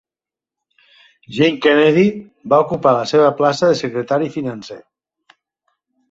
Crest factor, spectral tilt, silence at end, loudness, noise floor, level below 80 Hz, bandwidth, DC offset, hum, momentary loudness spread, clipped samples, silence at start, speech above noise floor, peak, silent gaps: 16 dB; -6 dB/octave; 1.35 s; -15 LUFS; -89 dBFS; -60 dBFS; 8 kHz; under 0.1%; none; 15 LU; under 0.1%; 1.3 s; 74 dB; -2 dBFS; none